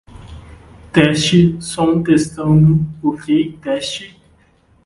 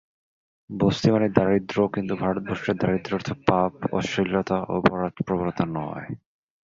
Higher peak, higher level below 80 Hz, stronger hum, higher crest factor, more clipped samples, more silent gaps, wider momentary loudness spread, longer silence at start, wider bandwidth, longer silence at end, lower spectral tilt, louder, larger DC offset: about the same, 0 dBFS vs -2 dBFS; first, -42 dBFS vs -50 dBFS; neither; second, 16 dB vs 22 dB; neither; neither; about the same, 9 LU vs 9 LU; second, 0.15 s vs 0.7 s; first, 11.5 kHz vs 7.6 kHz; first, 0.8 s vs 0.5 s; about the same, -6 dB/octave vs -7 dB/octave; first, -15 LUFS vs -24 LUFS; neither